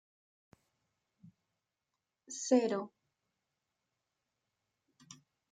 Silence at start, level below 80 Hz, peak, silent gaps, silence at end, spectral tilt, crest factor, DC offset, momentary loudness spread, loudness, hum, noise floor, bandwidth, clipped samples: 2.3 s; under -90 dBFS; -16 dBFS; none; 0.35 s; -4 dB/octave; 26 dB; under 0.1%; 26 LU; -33 LUFS; none; -89 dBFS; 9.6 kHz; under 0.1%